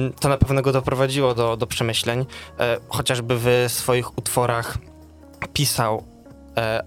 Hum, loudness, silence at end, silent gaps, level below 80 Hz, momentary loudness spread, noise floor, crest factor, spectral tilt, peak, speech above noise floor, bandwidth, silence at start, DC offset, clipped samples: none; -22 LUFS; 0 s; none; -40 dBFS; 9 LU; -45 dBFS; 20 dB; -4.5 dB/octave; -2 dBFS; 24 dB; 17 kHz; 0 s; under 0.1%; under 0.1%